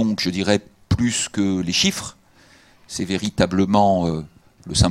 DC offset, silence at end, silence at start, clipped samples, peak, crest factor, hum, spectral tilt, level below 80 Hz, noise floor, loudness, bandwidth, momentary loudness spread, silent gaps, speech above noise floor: under 0.1%; 0 s; 0 s; under 0.1%; 0 dBFS; 20 dB; none; -4.5 dB/octave; -40 dBFS; -52 dBFS; -20 LUFS; 15 kHz; 12 LU; none; 32 dB